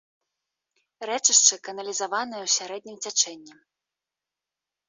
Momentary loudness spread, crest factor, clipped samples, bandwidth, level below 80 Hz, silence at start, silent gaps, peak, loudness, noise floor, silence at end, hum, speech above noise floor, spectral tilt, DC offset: 18 LU; 26 dB; under 0.1%; 8.2 kHz; -84 dBFS; 1 s; none; -2 dBFS; -22 LUFS; -89 dBFS; 1.35 s; none; 63 dB; 1.5 dB/octave; under 0.1%